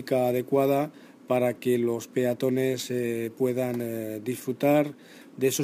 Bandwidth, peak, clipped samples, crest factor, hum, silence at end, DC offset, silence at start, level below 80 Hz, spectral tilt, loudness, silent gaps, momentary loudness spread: 15.5 kHz; -10 dBFS; under 0.1%; 16 dB; none; 0 s; under 0.1%; 0 s; -74 dBFS; -5.5 dB/octave; -27 LUFS; none; 9 LU